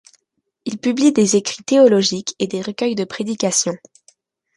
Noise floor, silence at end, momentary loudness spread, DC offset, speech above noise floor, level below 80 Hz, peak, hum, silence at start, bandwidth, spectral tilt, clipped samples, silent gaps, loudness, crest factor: -73 dBFS; 0.8 s; 11 LU; under 0.1%; 56 dB; -64 dBFS; -2 dBFS; none; 0.65 s; 11.5 kHz; -4 dB/octave; under 0.1%; none; -17 LUFS; 16 dB